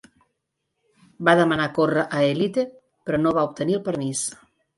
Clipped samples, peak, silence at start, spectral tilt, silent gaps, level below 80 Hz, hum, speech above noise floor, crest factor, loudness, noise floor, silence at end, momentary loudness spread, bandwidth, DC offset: under 0.1%; -4 dBFS; 1.2 s; -5 dB/octave; none; -60 dBFS; none; 57 dB; 20 dB; -22 LUFS; -78 dBFS; 0.45 s; 9 LU; 11.5 kHz; under 0.1%